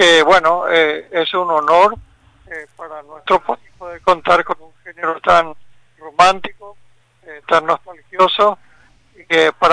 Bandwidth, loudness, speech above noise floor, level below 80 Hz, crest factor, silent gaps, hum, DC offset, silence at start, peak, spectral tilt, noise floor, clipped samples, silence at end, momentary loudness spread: 10.5 kHz; -14 LUFS; 37 dB; -50 dBFS; 14 dB; none; none; under 0.1%; 0 s; -2 dBFS; -3 dB/octave; -52 dBFS; under 0.1%; 0 s; 20 LU